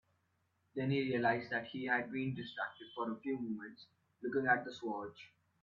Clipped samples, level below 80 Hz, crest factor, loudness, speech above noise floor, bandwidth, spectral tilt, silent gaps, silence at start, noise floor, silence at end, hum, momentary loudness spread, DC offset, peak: under 0.1%; -78 dBFS; 22 dB; -38 LUFS; 41 dB; 7.2 kHz; -4.5 dB/octave; none; 0.75 s; -79 dBFS; 0.35 s; none; 13 LU; under 0.1%; -18 dBFS